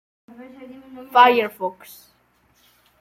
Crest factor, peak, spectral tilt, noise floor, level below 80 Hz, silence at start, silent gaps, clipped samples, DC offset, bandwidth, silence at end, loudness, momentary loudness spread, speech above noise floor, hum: 20 dB; -2 dBFS; -3.5 dB/octave; -61 dBFS; -70 dBFS; 0.4 s; none; under 0.1%; under 0.1%; 16 kHz; 1.3 s; -18 LUFS; 27 LU; 42 dB; none